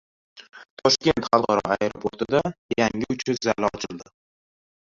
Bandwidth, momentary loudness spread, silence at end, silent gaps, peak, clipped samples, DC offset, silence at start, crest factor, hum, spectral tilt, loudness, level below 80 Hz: 7.8 kHz; 9 LU; 0.95 s; 0.70-0.77 s, 2.58-2.69 s; -2 dBFS; under 0.1%; under 0.1%; 0.35 s; 24 dB; none; -4 dB/octave; -23 LUFS; -54 dBFS